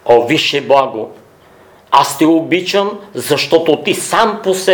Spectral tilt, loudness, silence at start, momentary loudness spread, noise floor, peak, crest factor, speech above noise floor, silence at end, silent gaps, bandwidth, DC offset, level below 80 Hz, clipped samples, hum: -3.5 dB/octave; -13 LUFS; 0.05 s; 10 LU; -43 dBFS; 0 dBFS; 14 dB; 31 dB; 0 s; none; over 20 kHz; under 0.1%; -56 dBFS; 0.2%; none